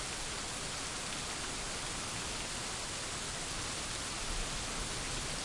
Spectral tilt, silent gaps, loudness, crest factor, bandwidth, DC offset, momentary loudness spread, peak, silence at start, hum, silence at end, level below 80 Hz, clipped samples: -1.5 dB/octave; none; -37 LUFS; 16 dB; 11.5 kHz; under 0.1%; 1 LU; -24 dBFS; 0 s; none; 0 s; -48 dBFS; under 0.1%